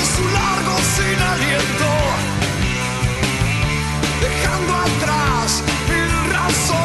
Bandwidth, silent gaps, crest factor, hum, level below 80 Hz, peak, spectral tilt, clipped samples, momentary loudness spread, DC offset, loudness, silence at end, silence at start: 12.5 kHz; none; 14 dB; none; -28 dBFS; -4 dBFS; -4 dB/octave; under 0.1%; 3 LU; under 0.1%; -17 LUFS; 0 s; 0 s